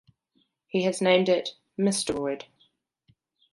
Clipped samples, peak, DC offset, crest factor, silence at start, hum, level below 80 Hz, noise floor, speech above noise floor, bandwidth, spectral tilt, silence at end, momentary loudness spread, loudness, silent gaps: under 0.1%; -6 dBFS; under 0.1%; 22 dB; 0.75 s; none; -64 dBFS; -71 dBFS; 47 dB; 11.5 kHz; -4.5 dB/octave; 1.1 s; 11 LU; -26 LUFS; none